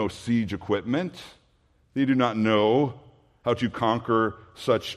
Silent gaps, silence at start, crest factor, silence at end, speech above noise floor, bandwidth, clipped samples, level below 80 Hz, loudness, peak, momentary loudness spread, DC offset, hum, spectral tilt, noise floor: none; 0 s; 18 dB; 0 s; 39 dB; 13 kHz; under 0.1%; -60 dBFS; -25 LUFS; -8 dBFS; 11 LU; under 0.1%; none; -6.5 dB/octave; -64 dBFS